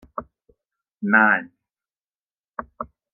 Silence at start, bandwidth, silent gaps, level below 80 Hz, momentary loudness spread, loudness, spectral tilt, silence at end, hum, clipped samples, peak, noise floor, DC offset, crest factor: 0.15 s; 3.2 kHz; 2.01-2.08 s, 2.15-2.28 s, 2.40-2.44 s, 2.50-2.54 s; -60 dBFS; 21 LU; -18 LUFS; -9 dB/octave; 0.3 s; none; under 0.1%; -2 dBFS; under -90 dBFS; under 0.1%; 24 dB